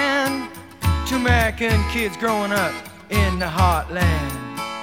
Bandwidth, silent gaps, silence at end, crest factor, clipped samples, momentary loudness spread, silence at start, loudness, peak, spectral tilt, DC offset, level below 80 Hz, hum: 16.5 kHz; none; 0 s; 18 dB; under 0.1%; 10 LU; 0 s; -21 LUFS; -2 dBFS; -5 dB/octave; 0.1%; -30 dBFS; none